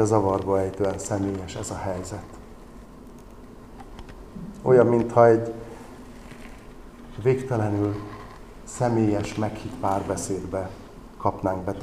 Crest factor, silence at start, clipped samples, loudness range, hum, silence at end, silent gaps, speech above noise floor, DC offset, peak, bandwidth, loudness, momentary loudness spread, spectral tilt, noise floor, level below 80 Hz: 22 dB; 0 s; under 0.1%; 9 LU; none; 0 s; none; 21 dB; 0.1%; -2 dBFS; 14.5 kHz; -24 LUFS; 27 LU; -7 dB/octave; -44 dBFS; -46 dBFS